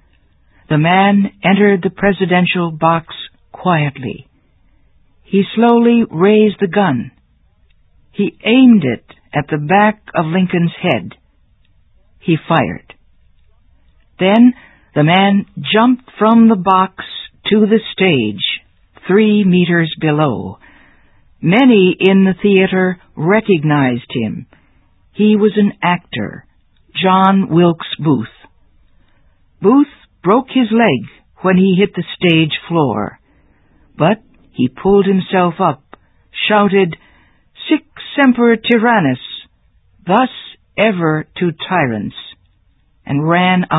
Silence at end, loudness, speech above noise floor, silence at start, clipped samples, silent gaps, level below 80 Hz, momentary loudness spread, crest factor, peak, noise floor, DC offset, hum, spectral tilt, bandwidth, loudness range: 0 s; -13 LUFS; 42 dB; 0.7 s; under 0.1%; none; -50 dBFS; 14 LU; 14 dB; 0 dBFS; -54 dBFS; under 0.1%; none; -10 dB/octave; 4 kHz; 4 LU